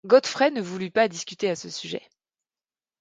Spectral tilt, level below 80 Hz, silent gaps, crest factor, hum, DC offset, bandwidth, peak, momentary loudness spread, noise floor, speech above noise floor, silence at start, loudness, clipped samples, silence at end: -4 dB/octave; -74 dBFS; none; 20 dB; none; under 0.1%; 9.2 kHz; -6 dBFS; 13 LU; under -90 dBFS; over 66 dB; 0.05 s; -25 LUFS; under 0.1%; 1 s